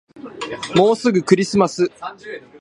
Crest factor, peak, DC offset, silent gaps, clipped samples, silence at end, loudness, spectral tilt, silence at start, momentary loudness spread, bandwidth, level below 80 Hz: 18 dB; 0 dBFS; under 0.1%; none; under 0.1%; 0.2 s; -17 LUFS; -5.5 dB/octave; 0.15 s; 19 LU; 11 kHz; -56 dBFS